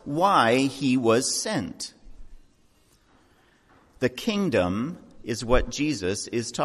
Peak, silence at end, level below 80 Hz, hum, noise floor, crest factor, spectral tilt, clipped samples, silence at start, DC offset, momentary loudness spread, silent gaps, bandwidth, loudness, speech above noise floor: -8 dBFS; 0 s; -42 dBFS; none; -61 dBFS; 18 dB; -4 dB/octave; under 0.1%; 0.05 s; under 0.1%; 14 LU; none; 14 kHz; -24 LUFS; 37 dB